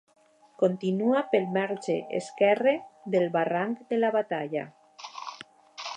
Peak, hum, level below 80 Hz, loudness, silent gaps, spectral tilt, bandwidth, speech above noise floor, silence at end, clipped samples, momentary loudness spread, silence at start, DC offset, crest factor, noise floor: -10 dBFS; none; -82 dBFS; -27 LUFS; none; -6 dB/octave; 10 kHz; 21 dB; 0 s; under 0.1%; 17 LU; 0.6 s; under 0.1%; 18 dB; -48 dBFS